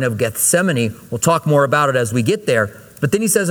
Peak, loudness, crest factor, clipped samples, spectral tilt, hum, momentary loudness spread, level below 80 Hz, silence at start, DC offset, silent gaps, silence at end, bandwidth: 0 dBFS; -16 LUFS; 16 dB; under 0.1%; -4.5 dB/octave; none; 6 LU; -54 dBFS; 0 s; under 0.1%; none; 0 s; over 20 kHz